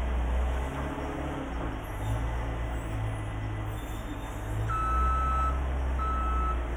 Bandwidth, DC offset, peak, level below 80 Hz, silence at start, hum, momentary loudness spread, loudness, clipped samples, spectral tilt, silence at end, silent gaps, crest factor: 14.5 kHz; under 0.1%; -16 dBFS; -32 dBFS; 0 s; none; 8 LU; -32 LUFS; under 0.1%; -7 dB/octave; 0 s; none; 12 dB